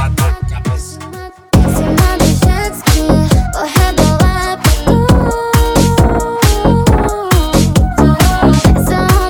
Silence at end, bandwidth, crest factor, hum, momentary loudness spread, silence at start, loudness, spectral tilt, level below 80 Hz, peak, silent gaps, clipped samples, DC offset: 0 s; over 20 kHz; 10 dB; none; 7 LU; 0 s; -11 LUFS; -5.5 dB/octave; -16 dBFS; 0 dBFS; none; under 0.1%; under 0.1%